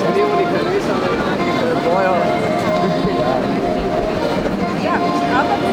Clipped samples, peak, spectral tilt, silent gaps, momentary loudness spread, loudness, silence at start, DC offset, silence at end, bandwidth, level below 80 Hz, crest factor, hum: under 0.1%; -2 dBFS; -6 dB/octave; none; 3 LU; -17 LUFS; 0 s; under 0.1%; 0 s; 19.5 kHz; -40 dBFS; 14 dB; none